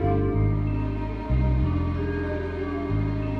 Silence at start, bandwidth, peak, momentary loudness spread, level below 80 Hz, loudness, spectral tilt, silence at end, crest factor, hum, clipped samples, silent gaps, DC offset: 0 s; 5.4 kHz; -12 dBFS; 6 LU; -30 dBFS; -26 LUFS; -10 dB/octave; 0 s; 12 dB; none; under 0.1%; none; under 0.1%